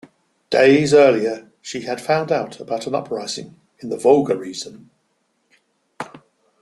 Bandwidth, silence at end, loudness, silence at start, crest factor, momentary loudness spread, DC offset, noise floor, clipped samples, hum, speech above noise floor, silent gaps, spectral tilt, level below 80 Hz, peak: 12 kHz; 0.45 s; -18 LUFS; 0.5 s; 18 dB; 22 LU; under 0.1%; -68 dBFS; under 0.1%; none; 50 dB; none; -5 dB/octave; -62 dBFS; -2 dBFS